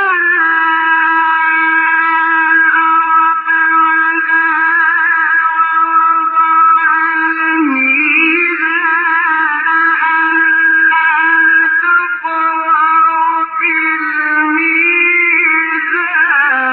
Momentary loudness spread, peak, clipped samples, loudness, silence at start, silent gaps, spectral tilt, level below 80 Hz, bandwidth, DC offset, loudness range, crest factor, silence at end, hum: 4 LU; 0 dBFS; under 0.1%; -10 LUFS; 0 s; none; -5.5 dB/octave; -80 dBFS; 4.5 kHz; under 0.1%; 1 LU; 10 dB; 0 s; none